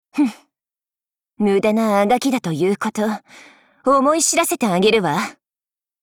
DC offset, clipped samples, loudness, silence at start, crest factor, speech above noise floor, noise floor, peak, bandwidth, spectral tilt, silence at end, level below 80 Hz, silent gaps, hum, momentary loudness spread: under 0.1%; under 0.1%; -18 LUFS; 0.15 s; 14 dB; over 73 dB; under -90 dBFS; -6 dBFS; over 20 kHz; -4 dB/octave; 0.7 s; -60 dBFS; none; none; 8 LU